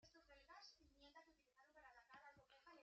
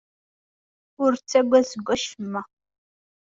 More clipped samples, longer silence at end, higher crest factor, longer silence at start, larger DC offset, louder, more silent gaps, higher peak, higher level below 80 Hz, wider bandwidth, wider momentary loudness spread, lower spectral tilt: neither; second, 0 s vs 0.95 s; about the same, 18 dB vs 20 dB; second, 0 s vs 1 s; neither; second, -67 LUFS vs -23 LUFS; neither; second, -50 dBFS vs -6 dBFS; second, -84 dBFS vs -64 dBFS; about the same, 7.4 kHz vs 7.8 kHz; second, 4 LU vs 13 LU; second, -1 dB/octave vs -4 dB/octave